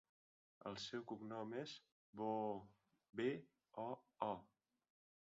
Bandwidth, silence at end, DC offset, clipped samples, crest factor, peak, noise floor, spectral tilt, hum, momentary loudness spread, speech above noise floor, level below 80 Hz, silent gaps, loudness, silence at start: 7.4 kHz; 0.85 s; under 0.1%; under 0.1%; 24 dB; -26 dBFS; under -90 dBFS; -4 dB/octave; none; 10 LU; over 43 dB; -86 dBFS; 1.92-2.13 s; -49 LUFS; 0.65 s